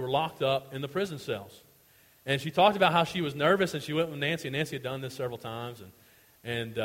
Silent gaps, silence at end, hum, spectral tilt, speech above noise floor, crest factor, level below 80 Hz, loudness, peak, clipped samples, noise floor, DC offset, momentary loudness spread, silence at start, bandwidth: none; 0 s; none; -5 dB/octave; 32 dB; 22 dB; -66 dBFS; -29 LUFS; -8 dBFS; under 0.1%; -61 dBFS; under 0.1%; 14 LU; 0 s; 16.5 kHz